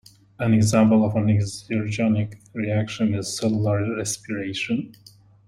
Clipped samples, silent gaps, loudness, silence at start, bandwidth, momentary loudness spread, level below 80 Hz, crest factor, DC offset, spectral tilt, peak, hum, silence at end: under 0.1%; none; -23 LUFS; 0.4 s; 13 kHz; 11 LU; -54 dBFS; 18 dB; under 0.1%; -6 dB/octave; -4 dBFS; none; 0.55 s